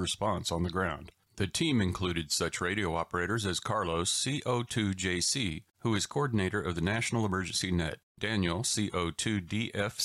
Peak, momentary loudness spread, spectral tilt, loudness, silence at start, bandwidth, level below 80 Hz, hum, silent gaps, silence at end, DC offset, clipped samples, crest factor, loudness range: -16 dBFS; 5 LU; -4 dB/octave; -31 LUFS; 0 s; 13.5 kHz; -52 dBFS; none; 8.03-8.15 s; 0 s; under 0.1%; under 0.1%; 16 dB; 1 LU